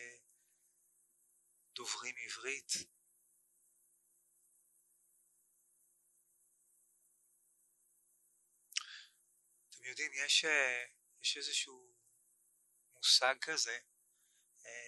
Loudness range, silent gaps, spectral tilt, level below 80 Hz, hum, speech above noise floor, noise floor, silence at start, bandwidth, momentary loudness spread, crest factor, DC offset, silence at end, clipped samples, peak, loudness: 16 LU; none; 2 dB/octave; under -90 dBFS; none; 38 dB; -76 dBFS; 0 s; 12 kHz; 22 LU; 28 dB; under 0.1%; 0 s; under 0.1%; -16 dBFS; -35 LUFS